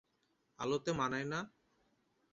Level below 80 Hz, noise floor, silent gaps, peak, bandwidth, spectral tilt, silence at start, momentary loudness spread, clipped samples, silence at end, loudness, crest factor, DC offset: -70 dBFS; -79 dBFS; none; -22 dBFS; 7.6 kHz; -4 dB/octave; 0.6 s; 7 LU; under 0.1%; 0.85 s; -38 LUFS; 20 dB; under 0.1%